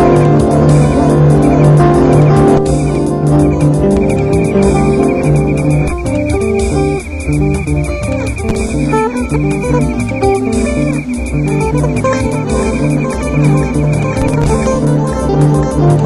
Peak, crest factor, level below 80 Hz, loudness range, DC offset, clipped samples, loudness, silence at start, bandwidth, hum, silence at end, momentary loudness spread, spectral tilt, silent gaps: 0 dBFS; 10 dB; -22 dBFS; 5 LU; 0.4%; under 0.1%; -12 LUFS; 0 s; 12 kHz; none; 0 s; 7 LU; -7.5 dB/octave; none